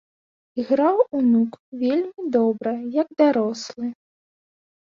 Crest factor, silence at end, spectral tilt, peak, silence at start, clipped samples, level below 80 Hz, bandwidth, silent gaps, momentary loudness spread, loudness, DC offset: 16 dB; 0.9 s; -6 dB/octave; -6 dBFS; 0.55 s; under 0.1%; -70 dBFS; 7.4 kHz; 1.59-1.72 s; 12 LU; -22 LUFS; under 0.1%